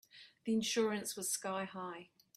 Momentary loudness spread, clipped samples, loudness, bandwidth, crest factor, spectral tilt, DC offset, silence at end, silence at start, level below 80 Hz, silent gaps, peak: 13 LU; under 0.1%; -38 LUFS; 16 kHz; 16 dB; -3 dB/octave; under 0.1%; 0.35 s; 0.15 s; -82 dBFS; none; -22 dBFS